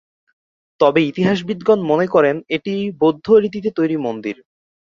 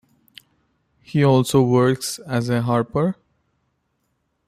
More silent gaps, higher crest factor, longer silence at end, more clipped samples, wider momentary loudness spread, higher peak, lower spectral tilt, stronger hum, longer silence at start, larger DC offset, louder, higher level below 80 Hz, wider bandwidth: neither; about the same, 16 dB vs 16 dB; second, 0.55 s vs 1.35 s; neither; about the same, 9 LU vs 9 LU; first, -2 dBFS vs -6 dBFS; about the same, -7.5 dB/octave vs -6.5 dB/octave; neither; second, 0.8 s vs 1.1 s; neither; about the same, -17 LUFS vs -19 LUFS; about the same, -58 dBFS vs -54 dBFS; second, 7.2 kHz vs 15 kHz